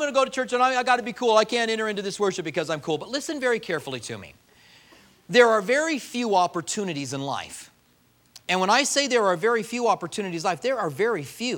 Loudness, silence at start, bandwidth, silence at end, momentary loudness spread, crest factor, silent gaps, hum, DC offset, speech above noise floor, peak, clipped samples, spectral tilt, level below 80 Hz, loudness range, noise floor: -24 LUFS; 0 s; 17 kHz; 0 s; 10 LU; 22 dB; none; none; under 0.1%; 38 dB; -4 dBFS; under 0.1%; -3 dB/octave; -68 dBFS; 4 LU; -62 dBFS